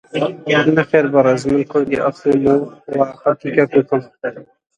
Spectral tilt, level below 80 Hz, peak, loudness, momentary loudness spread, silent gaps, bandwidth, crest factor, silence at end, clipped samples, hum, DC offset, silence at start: -7 dB/octave; -52 dBFS; 0 dBFS; -16 LUFS; 8 LU; none; 9.4 kHz; 16 dB; 0.35 s; under 0.1%; none; under 0.1%; 0.15 s